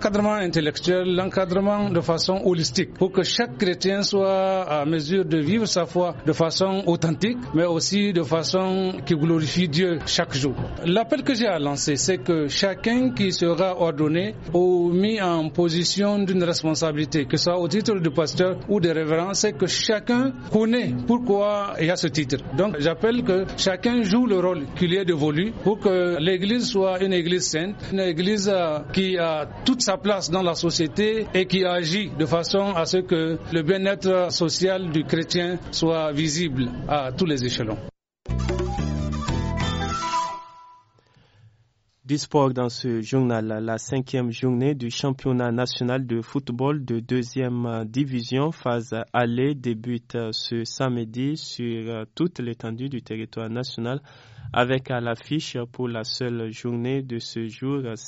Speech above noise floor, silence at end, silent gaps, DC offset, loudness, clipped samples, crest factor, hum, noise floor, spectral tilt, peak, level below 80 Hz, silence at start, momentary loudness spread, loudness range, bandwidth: 41 dB; 0 s; none; under 0.1%; -23 LUFS; under 0.1%; 18 dB; none; -64 dBFS; -4.5 dB/octave; -4 dBFS; -44 dBFS; 0 s; 7 LU; 6 LU; 8 kHz